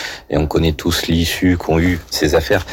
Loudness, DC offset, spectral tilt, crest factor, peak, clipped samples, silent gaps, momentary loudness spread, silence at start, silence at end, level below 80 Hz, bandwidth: -16 LUFS; under 0.1%; -5 dB/octave; 12 dB; -4 dBFS; under 0.1%; none; 3 LU; 0 s; 0 s; -30 dBFS; 17 kHz